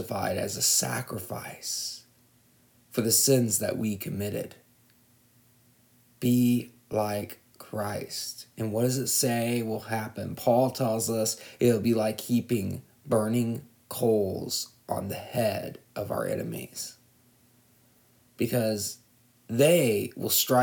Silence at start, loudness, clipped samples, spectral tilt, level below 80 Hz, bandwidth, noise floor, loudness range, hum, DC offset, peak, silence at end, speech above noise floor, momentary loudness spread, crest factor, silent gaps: 0 s; -28 LUFS; under 0.1%; -4 dB/octave; -68 dBFS; 19.5 kHz; -62 dBFS; 7 LU; none; under 0.1%; -10 dBFS; 0 s; 35 dB; 14 LU; 20 dB; none